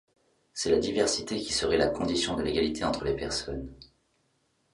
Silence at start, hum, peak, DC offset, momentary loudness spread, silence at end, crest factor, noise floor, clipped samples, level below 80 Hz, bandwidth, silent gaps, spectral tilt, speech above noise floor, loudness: 0.55 s; none; -10 dBFS; under 0.1%; 10 LU; 0.9 s; 20 dB; -72 dBFS; under 0.1%; -48 dBFS; 11.5 kHz; none; -3.5 dB/octave; 44 dB; -28 LUFS